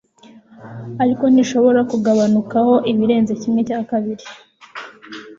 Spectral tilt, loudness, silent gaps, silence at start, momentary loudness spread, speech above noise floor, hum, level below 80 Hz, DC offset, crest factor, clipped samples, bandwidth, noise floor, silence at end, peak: -6.5 dB/octave; -16 LUFS; none; 0.6 s; 20 LU; 30 dB; none; -60 dBFS; under 0.1%; 14 dB; under 0.1%; 7.6 kHz; -46 dBFS; 0.05 s; -4 dBFS